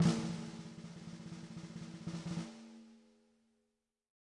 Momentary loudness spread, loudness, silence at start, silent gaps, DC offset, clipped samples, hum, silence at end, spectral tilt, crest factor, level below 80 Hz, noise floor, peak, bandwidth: 15 LU; -44 LUFS; 0 s; none; under 0.1%; under 0.1%; none; 1.2 s; -6 dB/octave; 22 dB; -70 dBFS; -85 dBFS; -20 dBFS; 11 kHz